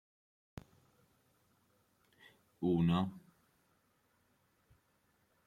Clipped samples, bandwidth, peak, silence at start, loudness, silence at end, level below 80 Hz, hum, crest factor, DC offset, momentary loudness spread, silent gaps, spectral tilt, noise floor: under 0.1%; 7.2 kHz; -20 dBFS; 2.6 s; -35 LUFS; 2.25 s; -70 dBFS; none; 22 dB; under 0.1%; 25 LU; none; -8.5 dB/octave; -76 dBFS